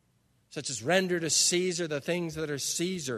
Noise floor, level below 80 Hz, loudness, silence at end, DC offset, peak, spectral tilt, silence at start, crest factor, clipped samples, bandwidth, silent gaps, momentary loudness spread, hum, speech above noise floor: -69 dBFS; -66 dBFS; -28 LUFS; 0 s; under 0.1%; -10 dBFS; -2.5 dB/octave; 0.5 s; 22 dB; under 0.1%; 13.5 kHz; none; 11 LU; none; 40 dB